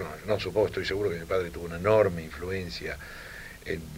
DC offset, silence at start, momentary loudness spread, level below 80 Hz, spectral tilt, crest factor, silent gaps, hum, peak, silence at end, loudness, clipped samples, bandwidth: under 0.1%; 0 s; 16 LU; -48 dBFS; -5.5 dB/octave; 20 dB; none; none; -10 dBFS; 0 s; -29 LUFS; under 0.1%; 16 kHz